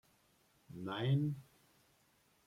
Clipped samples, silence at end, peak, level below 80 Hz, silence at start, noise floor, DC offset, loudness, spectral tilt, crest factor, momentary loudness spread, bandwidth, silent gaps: under 0.1%; 1.05 s; -24 dBFS; -78 dBFS; 0.7 s; -73 dBFS; under 0.1%; -38 LUFS; -8 dB/octave; 18 dB; 15 LU; 11.5 kHz; none